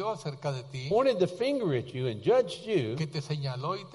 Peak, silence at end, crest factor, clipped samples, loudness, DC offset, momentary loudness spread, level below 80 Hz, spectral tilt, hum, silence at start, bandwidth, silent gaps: -14 dBFS; 0 s; 16 dB; under 0.1%; -30 LUFS; under 0.1%; 8 LU; -66 dBFS; -6.5 dB/octave; none; 0 s; 11.5 kHz; none